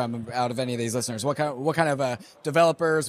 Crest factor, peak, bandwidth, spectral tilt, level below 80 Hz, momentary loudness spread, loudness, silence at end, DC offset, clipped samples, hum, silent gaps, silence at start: 18 dB; -8 dBFS; 15.5 kHz; -5 dB/octave; -66 dBFS; 7 LU; -25 LUFS; 0 s; under 0.1%; under 0.1%; none; none; 0 s